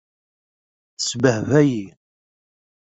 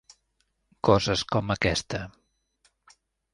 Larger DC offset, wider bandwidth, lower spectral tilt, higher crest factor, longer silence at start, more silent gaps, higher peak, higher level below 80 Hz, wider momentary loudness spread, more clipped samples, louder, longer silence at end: neither; second, 8.2 kHz vs 11.5 kHz; about the same, -5.5 dB/octave vs -4.5 dB/octave; about the same, 20 dB vs 24 dB; first, 1 s vs 0.85 s; neither; about the same, -2 dBFS vs -4 dBFS; second, -58 dBFS vs -48 dBFS; about the same, 12 LU vs 13 LU; neither; first, -19 LUFS vs -26 LUFS; second, 1.1 s vs 1.25 s